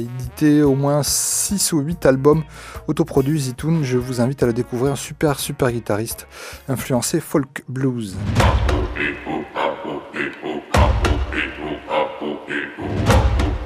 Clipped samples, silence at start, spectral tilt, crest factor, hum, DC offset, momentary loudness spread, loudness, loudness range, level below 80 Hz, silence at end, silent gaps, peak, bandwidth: under 0.1%; 0 s; -5 dB/octave; 18 dB; none; under 0.1%; 10 LU; -20 LUFS; 4 LU; -28 dBFS; 0 s; none; 0 dBFS; 15.5 kHz